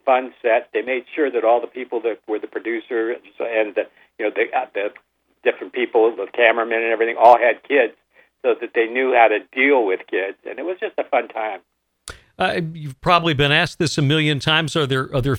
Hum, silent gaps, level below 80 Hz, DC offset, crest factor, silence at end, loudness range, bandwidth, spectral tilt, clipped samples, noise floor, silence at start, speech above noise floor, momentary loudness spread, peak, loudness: none; none; -50 dBFS; under 0.1%; 20 dB; 0 s; 7 LU; 14 kHz; -5.5 dB/octave; under 0.1%; -41 dBFS; 0.05 s; 22 dB; 12 LU; 0 dBFS; -19 LUFS